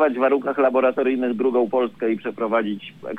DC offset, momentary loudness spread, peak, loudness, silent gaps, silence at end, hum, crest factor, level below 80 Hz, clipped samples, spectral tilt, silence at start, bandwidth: under 0.1%; 7 LU; -6 dBFS; -21 LUFS; none; 0 s; none; 14 dB; -70 dBFS; under 0.1%; -8 dB/octave; 0 s; 4.6 kHz